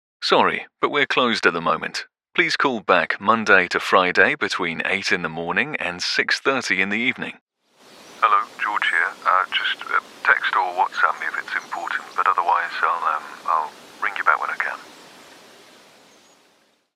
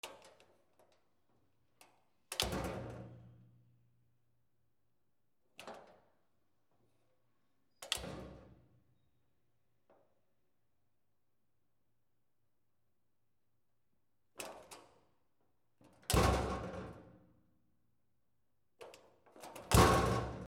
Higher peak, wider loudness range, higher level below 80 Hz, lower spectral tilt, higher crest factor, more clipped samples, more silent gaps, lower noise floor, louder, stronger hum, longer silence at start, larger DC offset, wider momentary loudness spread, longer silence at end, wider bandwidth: first, 0 dBFS vs -14 dBFS; second, 5 LU vs 21 LU; second, -70 dBFS vs -52 dBFS; second, -3 dB/octave vs -4.5 dB/octave; second, 22 dB vs 28 dB; neither; first, 7.41-7.47 s vs none; second, -61 dBFS vs -86 dBFS; first, -20 LUFS vs -34 LUFS; neither; first, 0.2 s vs 0.05 s; neither; second, 9 LU vs 28 LU; first, 1.95 s vs 0 s; about the same, 15.5 kHz vs 16 kHz